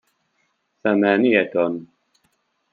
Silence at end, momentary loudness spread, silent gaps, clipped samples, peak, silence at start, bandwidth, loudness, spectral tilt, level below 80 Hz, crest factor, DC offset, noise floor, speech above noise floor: 0.9 s; 10 LU; none; under 0.1%; -2 dBFS; 0.85 s; 4.5 kHz; -19 LUFS; -8.5 dB/octave; -70 dBFS; 20 dB; under 0.1%; -69 dBFS; 51 dB